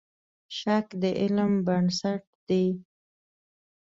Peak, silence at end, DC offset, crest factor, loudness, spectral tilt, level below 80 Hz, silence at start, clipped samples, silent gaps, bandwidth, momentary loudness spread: -12 dBFS; 1.05 s; under 0.1%; 16 dB; -27 LUFS; -6.5 dB/octave; -66 dBFS; 0.5 s; under 0.1%; 2.27-2.47 s; 7.8 kHz; 10 LU